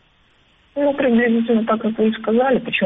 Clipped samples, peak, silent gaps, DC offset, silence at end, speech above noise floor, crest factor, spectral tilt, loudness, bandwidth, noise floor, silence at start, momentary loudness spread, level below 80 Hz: under 0.1%; -6 dBFS; none; under 0.1%; 0 s; 39 dB; 12 dB; -9.5 dB/octave; -18 LUFS; 3.9 kHz; -57 dBFS; 0.75 s; 5 LU; -54 dBFS